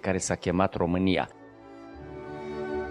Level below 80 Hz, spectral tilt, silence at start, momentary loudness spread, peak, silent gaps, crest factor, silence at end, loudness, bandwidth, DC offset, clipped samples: -54 dBFS; -5 dB/octave; 0.05 s; 21 LU; -8 dBFS; none; 22 dB; 0 s; -28 LUFS; 11.5 kHz; under 0.1%; under 0.1%